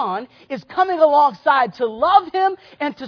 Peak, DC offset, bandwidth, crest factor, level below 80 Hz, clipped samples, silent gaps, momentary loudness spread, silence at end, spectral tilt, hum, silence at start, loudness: 0 dBFS; under 0.1%; 5.4 kHz; 18 dB; -62 dBFS; under 0.1%; none; 13 LU; 0 s; -6 dB/octave; none; 0 s; -17 LUFS